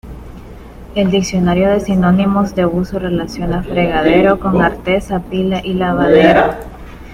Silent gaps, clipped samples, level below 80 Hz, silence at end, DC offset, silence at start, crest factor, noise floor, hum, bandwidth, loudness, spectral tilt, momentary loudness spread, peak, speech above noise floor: none; under 0.1%; -32 dBFS; 0 s; under 0.1%; 0.05 s; 14 dB; -33 dBFS; none; 12 kHz; -14 LUFS; -6.5 dB/octave; 12 LU; 0 dBFS; 20 dB